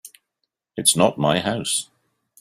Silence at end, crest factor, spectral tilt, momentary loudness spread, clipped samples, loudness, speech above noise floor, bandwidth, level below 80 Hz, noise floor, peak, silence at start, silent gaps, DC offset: 0.55 s; 22 dB; -3 dB/octave; 15 LU; under 0.1%; -20 LUFS; 58 dB; 16 kHz; -60 dBFS; -78 dBFS; -2 dBFS; 0.05 s; none; under 0.1%